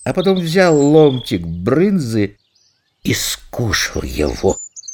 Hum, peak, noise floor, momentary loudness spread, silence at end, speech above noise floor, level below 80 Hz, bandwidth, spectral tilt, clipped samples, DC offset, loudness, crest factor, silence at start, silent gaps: none; 0 dBFS; -59 dBFS; 11 LU; 0 s; 44 dB; -36 dBFS; 19.5 kHz; -5 dB/octave; under 0.1%; under 0.1%; -16 LUFS; 16 dB; 0 s; none